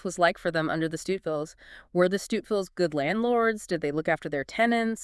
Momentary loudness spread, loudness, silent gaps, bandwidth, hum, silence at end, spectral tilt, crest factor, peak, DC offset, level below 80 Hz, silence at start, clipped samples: 7 LU; -27 LUFS; none; 12 kHz; none; 0 s; -5 dB/octave; 18 dB; -8 dBFS; under 0.1%; -60 dBFS; 0.05 s; under 0.1%